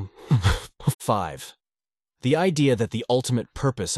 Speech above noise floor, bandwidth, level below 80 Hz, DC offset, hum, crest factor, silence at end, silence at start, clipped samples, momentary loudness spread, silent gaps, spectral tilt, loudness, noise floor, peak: over 67 dB; 12.5 kHz; -40 dBFS; under 0.1%; none; 16 dB; 0 s; 0 s; under 0.1%; 9 LU; 0.94-0.99 s; -5.5 dB/octave; -24 LUFS; under -90 dBFS; -8 dBFS